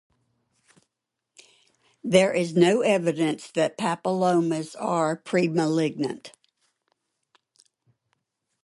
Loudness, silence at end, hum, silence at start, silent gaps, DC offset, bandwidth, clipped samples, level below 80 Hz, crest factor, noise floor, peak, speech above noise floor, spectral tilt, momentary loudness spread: -24 LUFS; 2.35 s; none; 2.05 s; none; under 0.1%; 11.5 kHz; under 0.1%; -72 dBFS; 22 dB; -84 dBFS; -4 dBFS; 60 dB; -5.5 dB/octave; 8 LU